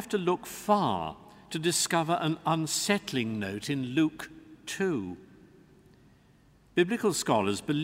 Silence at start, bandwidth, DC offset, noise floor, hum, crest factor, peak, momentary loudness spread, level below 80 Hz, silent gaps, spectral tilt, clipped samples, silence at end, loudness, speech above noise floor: 0 s; 16 kHz; under 0.1%; -60 dBFS; none; 20 dB; -10 dBFS; 13 LU; -64 dBFS; none; -4 dB/octave; under 0.1%; 0 s; -29 LUFS; 32 dB